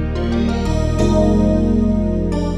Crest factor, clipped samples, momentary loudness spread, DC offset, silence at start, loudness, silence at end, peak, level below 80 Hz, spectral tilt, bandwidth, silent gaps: 12 dB; under 0.1%; 5 LU; under 0.1%; 0 s; -17 LUFS; 0 s; -4 dBFS; -22 dBFS; -7.5 dB/octave; 10.5 kHz; none